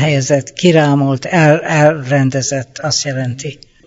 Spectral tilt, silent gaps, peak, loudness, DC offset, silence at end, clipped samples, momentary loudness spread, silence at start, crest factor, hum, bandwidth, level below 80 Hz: -5 dB/octave; none; 0 dBFS; -13 LUFS; under 0.1%; 0.35 s; under 0.1%; 9 LU; 0 s; 14 dB; none; 8 kHz; -52 dBFS